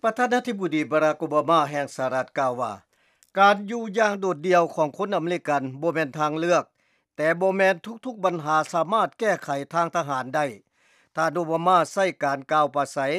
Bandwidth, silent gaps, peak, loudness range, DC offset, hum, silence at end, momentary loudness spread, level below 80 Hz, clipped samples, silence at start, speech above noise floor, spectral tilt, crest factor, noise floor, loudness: 14 kHz; none; -6 dBFS; 2 LU; under 0.1%; none; 0 s; 7 LU; -82 dBFS; under 0.1%; 0.05 s; 38 dB; -5 dB/octave; 18 dB; -61 dBFS; -24 LUFS